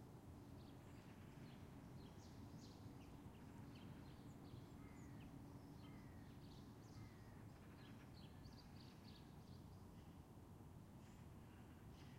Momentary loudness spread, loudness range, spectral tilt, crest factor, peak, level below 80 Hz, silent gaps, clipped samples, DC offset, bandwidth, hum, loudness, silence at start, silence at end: 3 LU; 2 LU; -6.5 dB/octave; 14 dB; -46 dBFS; -70 dBFS; none; under 0.1%; under 0.1%; 16 kHz; none; -61 LUFS; 0 s; 0 s